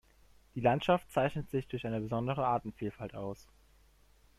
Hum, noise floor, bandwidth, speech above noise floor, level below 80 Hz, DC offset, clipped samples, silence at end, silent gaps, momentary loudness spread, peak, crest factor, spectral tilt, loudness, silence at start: none; -64 dBFS; 14 kHz; 31 dB; -60 dBFS; under 0.1%; under 0.1%; 0.95 s; none; 13 LU; -14 dBFS; 20 dB; -7.5 dB/octave; -34 LUFS; 0.55 s